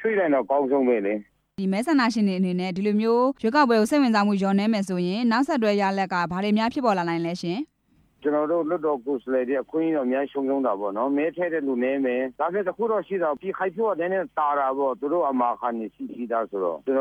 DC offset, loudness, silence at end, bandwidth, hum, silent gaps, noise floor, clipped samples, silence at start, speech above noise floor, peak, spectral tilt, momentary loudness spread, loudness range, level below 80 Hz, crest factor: under 0.1%; -24 LUFS; 0 s; 13 kHz; none; none; -63 dBFS; under 0.1%; 0 s; 39 dB; -8 dBFS; -6.5 dB/octave; 7 LU; 4 LU; -66 dBFS; 16 dB